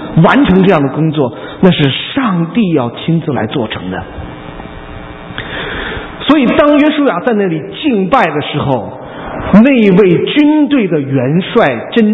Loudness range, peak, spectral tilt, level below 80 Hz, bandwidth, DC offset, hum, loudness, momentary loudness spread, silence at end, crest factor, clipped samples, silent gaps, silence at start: 7 LU; 0 dBFS; -9 dB/octave; -36 dBFS; 5.8 kHz; under 0.1%; none; -11 LUFS; 18 LU; 0 s; 10 dB; 0.4%; none; 0 s